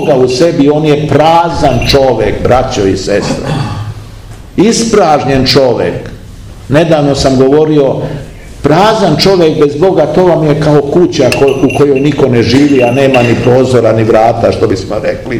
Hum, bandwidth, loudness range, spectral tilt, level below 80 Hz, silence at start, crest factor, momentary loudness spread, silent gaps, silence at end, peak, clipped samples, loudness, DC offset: none; 15.5 kHz; 3 LU; -6 dB/octave; -28 dBFS; 0 s; 8 dB; 8 LU; none; 0 s; 0 dBFS; 5%; -8 LUFS; under 0.1%